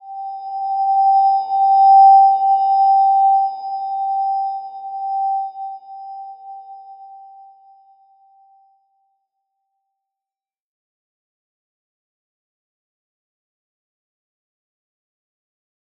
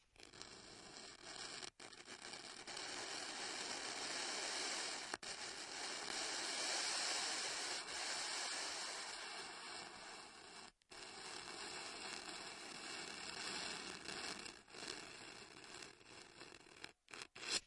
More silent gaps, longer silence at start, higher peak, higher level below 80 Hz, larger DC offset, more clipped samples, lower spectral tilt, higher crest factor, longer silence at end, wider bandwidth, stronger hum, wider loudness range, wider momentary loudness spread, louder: neither; second, 0.05 s vs 0.2 s; first, -4 dBFS vs -24 dBFS; second, under -90 dBFS vs -80 dBFS; neither; neither; first, -4.5 dB/octave vs 0 dB/octave; second, 16 dB vs 24 dB; first, 8.8 s vs 0 s; second, 5.2 kHz vs 12 kHz; neither; first, 16 LU vs 9 LU; first, 24 LU vs 15 LU; first, -15 LUFS vs -46 LUFS